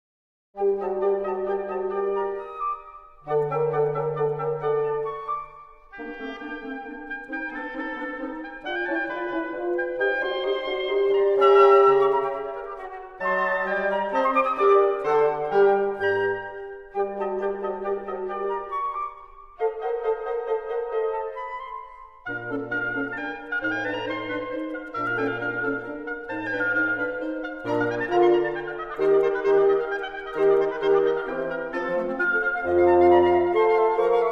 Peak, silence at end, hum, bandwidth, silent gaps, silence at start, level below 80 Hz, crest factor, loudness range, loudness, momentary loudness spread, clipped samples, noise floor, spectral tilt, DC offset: -6 dBFS; 0 s; none; 6 kHz; none; 0.55 s; -56 dBFS; 18 dB; 9 LU; -24 LUFS; 14 LU; under 0.1%; -46 dBFS; -7 dB/octave; 0.1%